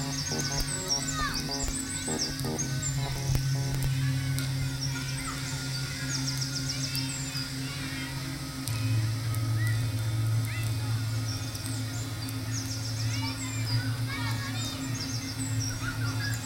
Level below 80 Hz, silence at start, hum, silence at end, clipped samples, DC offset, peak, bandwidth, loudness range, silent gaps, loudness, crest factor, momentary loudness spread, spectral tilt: -44 dBFS; 0 s; none; 0 s; under 0.1%; under 0.1%; -10 dBFS; 16.5 kHz; 2 LU; none; -31 LUFS; 20 dB; 5 LU; -4 dB/octave